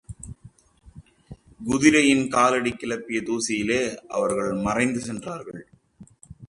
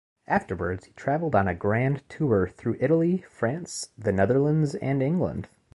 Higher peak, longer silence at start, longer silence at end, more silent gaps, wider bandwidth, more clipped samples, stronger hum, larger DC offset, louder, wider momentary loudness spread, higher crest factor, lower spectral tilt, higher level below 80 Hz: first, -4 dBFS vs -8 dBFS; second, 0.1 s vs 0.3 s; second, 0.05 s vs 0.3 s; neither; about the same, 11.5 kHz vs 11.5 kHz; neither; neither; neither; first, -22 LUFS vs -26 LUFS; first, 20 LU vs 8 LU; about the same, 22 dB vs 18 dB; second, -4 dB/octave vs -7 dB/octave; about the same, -52 dBFS vs -48 dBFS